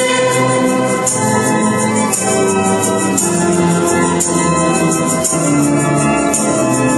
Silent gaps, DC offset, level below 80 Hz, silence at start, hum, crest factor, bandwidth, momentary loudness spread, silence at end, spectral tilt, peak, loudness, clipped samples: none; under 0.1%; -44 dBFS; 0 s; none; 12 dB; 12.5 kHz; 1 LU; 0 s; -4.5 dB/octave; 0 dBFS; -13 LUFS; under 0.1%